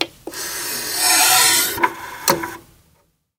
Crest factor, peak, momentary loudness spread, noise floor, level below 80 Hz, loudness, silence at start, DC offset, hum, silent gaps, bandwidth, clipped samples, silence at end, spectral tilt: 20 dB; 0 dBFS; 15 LU; -61 dBFS; -54 dBFS; -16 LUFS; 0 s; under 0.1%; none; none; 18 kHz; under 0.1%; 0.8 s; 0 dB/octave